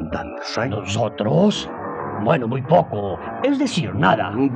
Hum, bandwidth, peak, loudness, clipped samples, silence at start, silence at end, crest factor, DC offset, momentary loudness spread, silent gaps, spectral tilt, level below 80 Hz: none; 9.8 kHz; -2 dBFS; -21 LUFS; under 0.1%; 0 s; 0 s; 18 dB; under 0.1%; 10 LU; none; -6 dB/octave; -50 dBFS